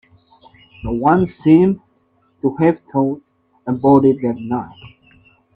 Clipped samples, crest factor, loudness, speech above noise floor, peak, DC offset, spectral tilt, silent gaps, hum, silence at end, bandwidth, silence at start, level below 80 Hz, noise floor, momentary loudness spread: under 0.1%; 18 dB; -16 LUFS; 45 dB; 0 dBFS; under 0.1%; -11 dB/octave; none; none; 0.7 s; 4.2 kHz; 0.85 s; -46 dBFS; -60 dBFS; 16 LU